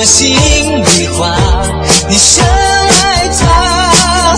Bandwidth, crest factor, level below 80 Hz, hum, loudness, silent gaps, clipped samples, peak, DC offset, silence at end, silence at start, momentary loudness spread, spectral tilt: 11 kHz; 8 dB; -18 dBFS; none; -7 LUFS; none; 0.6%; 0 dBFS; under 0.1%; 0 s; 0 s; 6 LU; -2.5 dB/octave